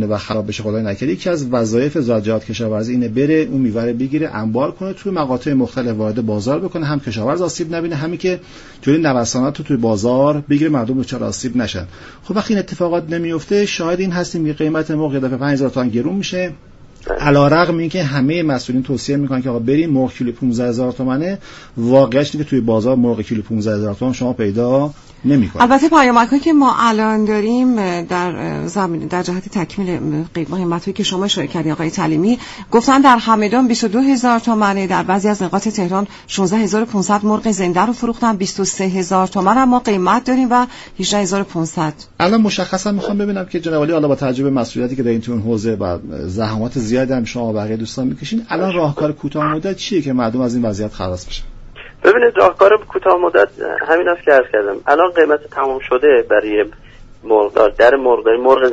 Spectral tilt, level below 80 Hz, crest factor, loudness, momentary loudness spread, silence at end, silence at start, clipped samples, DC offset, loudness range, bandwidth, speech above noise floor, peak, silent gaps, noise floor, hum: -5.5 dB/octave; -42 dBFS; 16 dB; -16 LUFS; 9 LU; 0 s; 0 s; under 0.1%; under 0.1%; 6 LU; 8 kHz; 20 dB; 0 dBFS; none; -35 dBFS; none